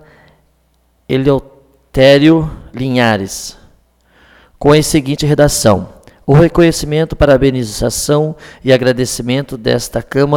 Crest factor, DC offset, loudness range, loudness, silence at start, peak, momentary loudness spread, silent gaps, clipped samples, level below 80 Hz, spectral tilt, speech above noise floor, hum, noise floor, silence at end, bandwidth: 12 dB; under 0.1%; 3 LU; -12 LUFS; 1.1 s; 0 dBFS; 12 LU; none; under 0.1%; -32 dBFS; -5.5 dB/octave; 44 dB; none; -56 dBFS; 0 s; 17.5 kHz